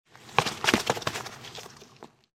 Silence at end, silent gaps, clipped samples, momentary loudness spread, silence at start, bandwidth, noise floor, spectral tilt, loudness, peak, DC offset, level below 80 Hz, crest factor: 0.3 s; none; under 0.1%; 20 LU; 0.2 s; 16 kHz; -52 dBFS; -3 dB/octave; -27 LUFS; -2 dBFS; under 0.1%; -58 dBFS; 30 dB